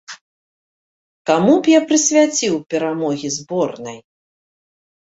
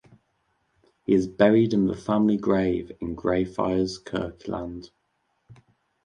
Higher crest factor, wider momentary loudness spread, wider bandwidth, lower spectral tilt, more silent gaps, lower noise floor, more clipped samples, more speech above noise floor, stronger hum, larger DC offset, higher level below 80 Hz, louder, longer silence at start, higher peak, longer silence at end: about the same, 18 dB vs 20 dB; about the same, 15 LU vs 14 LU; second, 8 kHz vs 9.8 kHz; second, -3.5 dB/octave vs -7.5 dB/octave; first, 0.21-1.25 s vs none; first, under -90 dBFS vs -73 dBFS; neither; first, over 74 dB vs 49 dB; neither; neither; second, -64 dBFS vs -50 dBFS; first, -16 LUFS vs -24 LUFS; second, 0.1 s vs 1.1 s; first, -2 dBFS vs -6 dBFS; first, 1.05 s vs 0.5 s